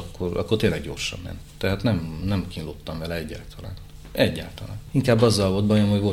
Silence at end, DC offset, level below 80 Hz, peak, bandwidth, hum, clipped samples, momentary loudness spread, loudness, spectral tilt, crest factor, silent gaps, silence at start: 0 s; under 0.1%; -42 dBFS; -6 dBFS; 16 kHz; none; under 0.1%; 18 LU; -24 LUFS; -6 dB/octave; 18 dB; none; 0 s